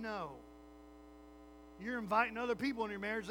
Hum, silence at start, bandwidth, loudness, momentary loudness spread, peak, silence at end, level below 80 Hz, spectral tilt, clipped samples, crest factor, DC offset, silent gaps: none; 0 s; over 20 kHz; -38 LUFS; 24 LU; -18 dBFS; 0 s; -64 dBFS; -5.5 dB/octave; under 0.1%; 22 dB; under 0.1%; none